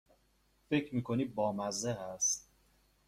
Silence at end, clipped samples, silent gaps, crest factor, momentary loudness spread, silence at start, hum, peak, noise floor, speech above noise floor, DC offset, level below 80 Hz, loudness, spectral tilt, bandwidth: 0.65 s; under 0.1%; none; 18 dB; 5 LU; 0.7 s; none; -20 dBFS; -72 dBFS; 37 dB; under 0.1%; -68 dBFS; -35 LUFS; -4 dB/octave; 16 kHz